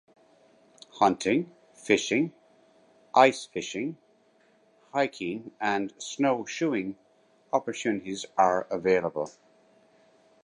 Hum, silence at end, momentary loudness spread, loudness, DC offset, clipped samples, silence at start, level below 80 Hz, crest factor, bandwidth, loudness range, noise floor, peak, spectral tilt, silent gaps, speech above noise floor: none; 1.15 s; 12 LU; -27 LUFS; under 0.1%; under 0.1%; 0.95 s; -70 dBFS; 24 dB; 11.5 kHz; 4 LU; -64 dBFS; -6 dBFS; -4.5 dB/octave; none; 37 dB